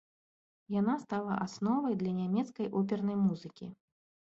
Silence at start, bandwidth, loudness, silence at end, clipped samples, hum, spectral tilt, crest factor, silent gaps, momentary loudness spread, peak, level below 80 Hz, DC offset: 0.7 s; 7.8 kHz; -33 LUFS; 0.55 s; under 0.1%; none; -8 dB/octave; 16 dB; none; 10 LU; -20 dBFS; -74 dBFS; under 0.1%